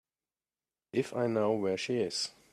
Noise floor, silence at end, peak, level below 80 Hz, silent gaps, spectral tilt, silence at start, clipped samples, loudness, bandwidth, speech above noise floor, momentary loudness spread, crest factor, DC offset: under -90 dBFS; 0.2 s; -16 dBFS; -76 dBFS; none; -4.5 dB/octave; 0.95 s; under 0.1%; -32 LUFS; 13.5 kHz; over 59 dB; 5 LU; 16 dB; under 0.1%